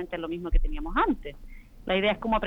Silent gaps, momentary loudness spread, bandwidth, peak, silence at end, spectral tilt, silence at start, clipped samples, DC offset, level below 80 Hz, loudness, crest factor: none; 10 LU; 4.1 kHz; -10 dBFS; 0 s; -7.5 dB/octave; 0 s; under 0.1%; under 0.1%; -32 dBFS; -28 LUFS; 16 dB